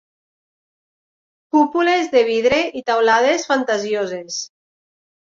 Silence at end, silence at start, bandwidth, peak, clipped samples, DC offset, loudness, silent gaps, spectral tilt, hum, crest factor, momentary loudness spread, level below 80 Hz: 0.9 s; 1.55 s; 7.6 kHz; -2 dBFS; under 0.1%; under 0.1%; -18 LUFS; none; -3 dB/octave; none; 18 dB; 11 LU; -58 dBFS